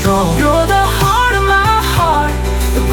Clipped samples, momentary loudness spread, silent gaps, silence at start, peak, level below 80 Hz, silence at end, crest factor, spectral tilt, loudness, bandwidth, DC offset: under 0.1%; 5 LU; none; 0 s; 0 dBFS; -18 dBFS; 0 s; 12 dB; -4.5 dB/octave; -12 LUFS; 19.5 kHz; under 0.1%